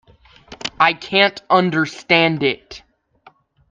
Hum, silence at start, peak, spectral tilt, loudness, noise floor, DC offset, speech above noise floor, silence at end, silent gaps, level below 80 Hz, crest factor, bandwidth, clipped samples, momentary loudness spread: none; 0.5 s; 0 dBFS; -5 dB/octave; -16 LUFS; -52 dBFS; under 0.1%; 35 dB; 0.9 s; none; -56 dBFS; 20 dB; 9.4 kHz; under 0.1%; 13 LU